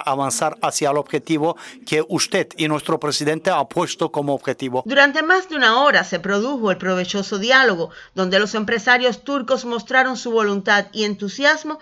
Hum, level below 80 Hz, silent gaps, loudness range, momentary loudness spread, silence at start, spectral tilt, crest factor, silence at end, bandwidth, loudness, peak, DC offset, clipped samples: none; -62 dBFS; none; 4 LU; 9 LU; 0 s; -3.5 dB/octave; 20 dB; 0.05 s; 13.5 kHz; -18 LUFS; 0 dBFS; under 0.1%; under 0.1%